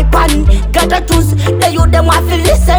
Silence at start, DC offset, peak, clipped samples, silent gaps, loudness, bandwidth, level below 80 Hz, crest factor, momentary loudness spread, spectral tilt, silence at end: 0 s; under 0.1%; 0 dBFS; under 0.1%; none; -10 LUFS; over 20 kHz; -12 dBFS; 8 dB; 2 LU; -5 dB/octave; 0 s